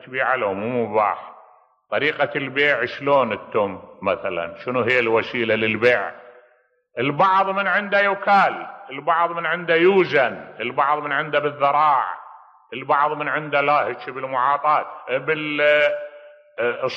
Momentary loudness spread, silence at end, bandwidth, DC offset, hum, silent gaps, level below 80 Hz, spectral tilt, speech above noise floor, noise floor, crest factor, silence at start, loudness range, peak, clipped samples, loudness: 11 LU; 0 s; 7.6 kHz; under 0.1%; none; none; -68 dBFS; -6.5 dB/octave; 40 dB; -60 dBFS; 16 dB; 0.05 s; 3 LU; -6 dBFS; under 0.1%; -20 LUFS